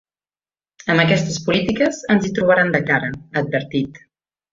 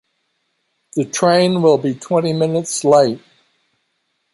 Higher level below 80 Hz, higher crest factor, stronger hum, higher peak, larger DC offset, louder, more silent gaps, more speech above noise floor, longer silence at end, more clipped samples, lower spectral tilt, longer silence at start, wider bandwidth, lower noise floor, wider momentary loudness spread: first, -50 dBFS vs -62 dBFS; about the same, 18 dB vs 16 dB; neither; about the same, -2 dBFS vs -2 dBFS; neither; about the same, -18 LUFS vs -16 LUFS; neither; first, over 72 dB vs 54 dB; second, 0.55 s vs 1.15 s; neither; about the same, -5.5 dB/octave vs -5 dB/octave; about the same, 0.85 s vs 0.95 s; second, 7.8 kHz vs 11.5 kHz; first, under -90 dBFS vs -69 dBFS; about the same, 9 LU vs 9 LU